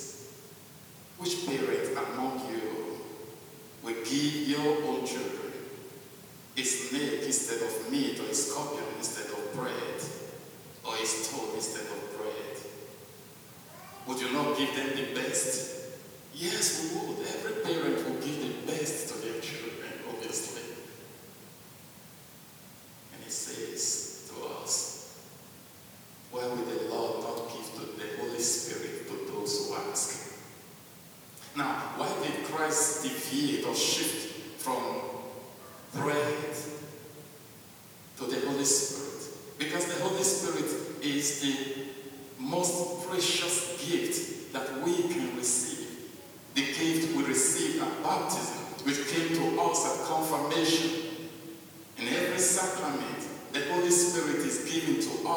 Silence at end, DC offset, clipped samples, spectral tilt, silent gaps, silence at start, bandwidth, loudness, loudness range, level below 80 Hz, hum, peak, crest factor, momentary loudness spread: 0 s; under 0.1%; under 0.1%; -2.5 dB/octave; none; 0 s; over 20 kHz; -31 LUFS; 7 LU; -76 dBFS; none; -12 dBFS; 22 dB; 21 LU